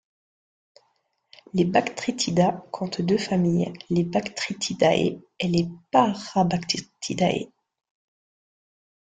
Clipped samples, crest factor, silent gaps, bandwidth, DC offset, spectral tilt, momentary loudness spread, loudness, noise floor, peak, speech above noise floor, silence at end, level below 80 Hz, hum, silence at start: under 0.1%; 20 dB; none; 9.4 kHz; under 0.1%; -5.5 dB/octave; 9 LU; -24 LUFS; -71 dBFS; -6 dBFS; 47 dB; 1.6 s; -60 dBFS; none; 1.55 s